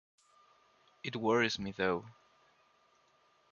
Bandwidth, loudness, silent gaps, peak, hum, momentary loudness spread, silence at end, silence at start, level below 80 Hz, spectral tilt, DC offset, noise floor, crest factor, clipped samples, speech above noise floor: 7.6 kHz; -34 LUFS; none; -16 dBFS; none; 14 LU; 1.4 s; 1.05 s; -68 dBFS; -4.5 dB/octave; under 0.1%; -70 dBFS; 22 dB; under 0.1%; 36 dB